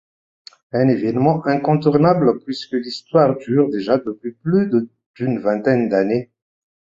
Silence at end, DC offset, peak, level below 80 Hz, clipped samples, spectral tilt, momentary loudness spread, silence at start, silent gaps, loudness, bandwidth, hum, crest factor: 0.6 s; under 0.1%; -2 dBFS; -58 dBFS; under 0.1%; -8.5 dB/octave; 10 LU; 0.75 s; 5.06-5.14 s; -18 LUFS; 7.6 kHz; none; 18 dB